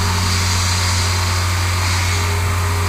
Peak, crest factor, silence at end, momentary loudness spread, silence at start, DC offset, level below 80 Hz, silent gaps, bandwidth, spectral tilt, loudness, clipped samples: -6 dBFS; 12 dB; 0 s; 2 LU; 0 s; under 0.1%; -30 dBFS; none; 16 kHz; -3 dB/octave; -17 LUFS; under 0.1%